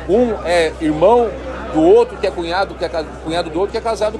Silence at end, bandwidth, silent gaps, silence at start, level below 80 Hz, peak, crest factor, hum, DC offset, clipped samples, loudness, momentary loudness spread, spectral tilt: 0 s; 11.5 kHz; none; 0 s; -34 dBFS; -2 dBFS; 14 dB; none; under 0.1%; under 0.1%; -16 LUFS; 11 LU; -5.5 dB/octave